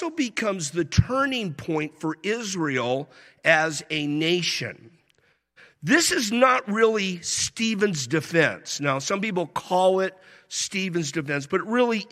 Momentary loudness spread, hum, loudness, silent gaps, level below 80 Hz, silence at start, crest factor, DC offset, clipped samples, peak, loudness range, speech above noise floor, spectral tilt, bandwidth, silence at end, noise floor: 9 LU; none; -24 LUFS; none; -50 dBFS; 0 s; 22 dB; under 0.1%; under 0.1%; -4 dBFS; 3 LU; 41 dB; -4 dB/octave; 15 kHz; 0.1 s; -65 dBFS